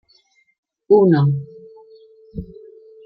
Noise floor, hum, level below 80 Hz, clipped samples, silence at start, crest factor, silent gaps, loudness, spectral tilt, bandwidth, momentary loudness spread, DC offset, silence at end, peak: -59 dBFS; none; -50 dBFS; under 0.1%; 0.9 s; 18 dB; none; -16 LUFS; -11.5 dB/octave; 4.9 kHz; 25 LU; under 0.1%; 0.6 s; -2 dBFS